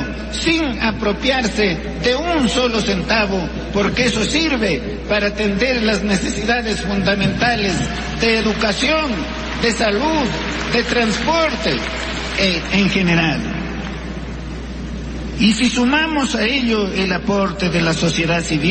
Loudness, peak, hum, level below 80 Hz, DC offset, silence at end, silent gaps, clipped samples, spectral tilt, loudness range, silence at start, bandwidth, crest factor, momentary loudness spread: -17 LUFS; -4 dBFS; none; -30 dBFS; under 0.1%; 0 s; none; under 0.1%; -4.5 dB/octave; 2 LU; 0 s; 8.8 kHz; 14 dB; 8 LU